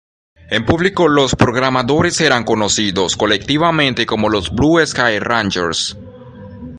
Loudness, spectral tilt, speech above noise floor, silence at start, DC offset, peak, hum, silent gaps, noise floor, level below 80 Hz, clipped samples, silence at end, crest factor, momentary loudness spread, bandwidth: -14 LUFS; -4 dB/octave; 20 dB; 0.5 s; under 0.1%; 0 dBFS; none; none; -35 dBFS; -38 dBFS; under 0.1%; 0 s; 16 dB; 5 LU; 11.5 kHz